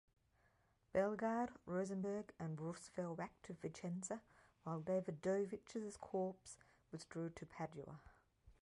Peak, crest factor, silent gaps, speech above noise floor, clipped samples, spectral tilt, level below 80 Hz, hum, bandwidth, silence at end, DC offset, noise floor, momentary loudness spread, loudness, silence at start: -28 dBFS; 20 dB; none; 33 dB; under 0.1%; -6.5 dB/octave; -76 dBFS; none; 11.5 kHz; 0.1 s; under 0.1%; -78 dBFS; 14 LU; -46 LUFS; 0.95 s